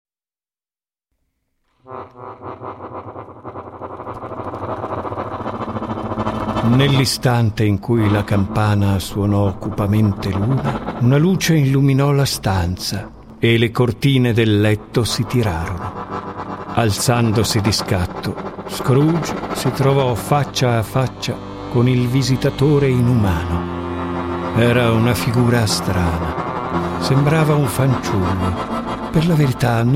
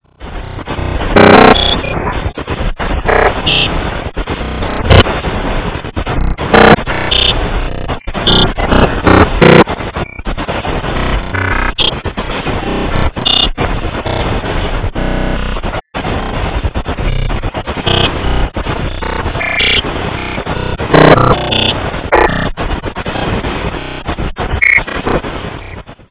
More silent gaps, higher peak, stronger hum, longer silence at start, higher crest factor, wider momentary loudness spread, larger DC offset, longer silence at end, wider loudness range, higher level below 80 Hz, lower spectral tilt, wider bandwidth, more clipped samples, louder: neither; about the same, -2 dBFS vs 0 dBFS; neither; first, 1.85 s vs 0.2 s; about the same, 16 dB vs 12 dB; about the same, 14 LU vs 14 LU; neither; about the same, 0 s vs 0.1 s; first, 11 LU vs 6 LU; second, -38 dBFS vs -20 dBFS; second, -6 dB/octave vs -9.5 dB/octave; first, 16 kHz vs 4 kHz; second, under 0.1% vs 2%; second, -18 LUFS vs -12 LUFS